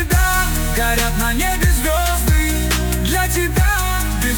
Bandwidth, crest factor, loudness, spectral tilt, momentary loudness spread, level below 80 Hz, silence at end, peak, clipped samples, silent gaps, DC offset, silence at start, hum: 19.5 kHz; 12 dB; -17 LUFS; -4 dB/octave; 2 LU; -20 dBFS; 0 s; -4 dBFS; under 0.1%; none; under 0.1%; 0 s; none